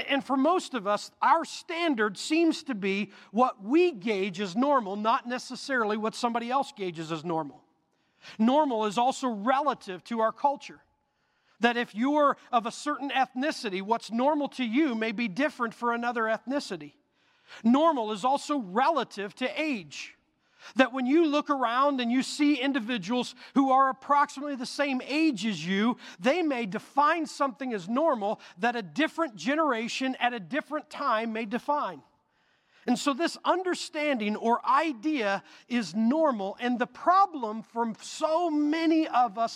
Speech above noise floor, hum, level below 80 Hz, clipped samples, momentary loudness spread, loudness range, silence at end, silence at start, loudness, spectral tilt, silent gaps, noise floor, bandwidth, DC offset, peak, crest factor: 46 dB; none; -80 dBFS; under 0.1%; 8 LU; 3 LU; 0 s; 0 s; -28 LUFS; -4.5 dB/octave; none; -73 dBFS; 13 kHz; under 0.1%; -6 dBFS; 22 dB